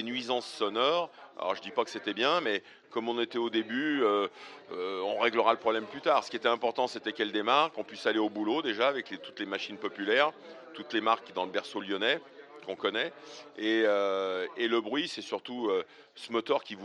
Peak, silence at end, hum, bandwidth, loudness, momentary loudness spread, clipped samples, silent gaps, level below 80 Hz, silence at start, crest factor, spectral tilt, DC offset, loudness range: -10 dBFS; 0 s; none; 11 kHz; -31 LUFS; 11 LU; under 0.1%; none; -88 dBFS; 0 s; 22 dB; -4 dB/octave; under 0.1%; 2 LU